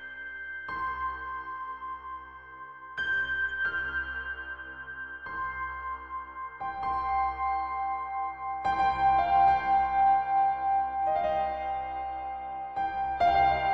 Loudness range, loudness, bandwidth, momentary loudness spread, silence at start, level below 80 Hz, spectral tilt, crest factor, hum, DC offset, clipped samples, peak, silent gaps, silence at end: 9 LU; -29 LUFS; 6 kHz; 15 LU; 0 s; -52 dBFS; -5.5 dB/octave; 16 dB; none; under 0.1%; under 0.1%; -14 dBFS; none; 0 s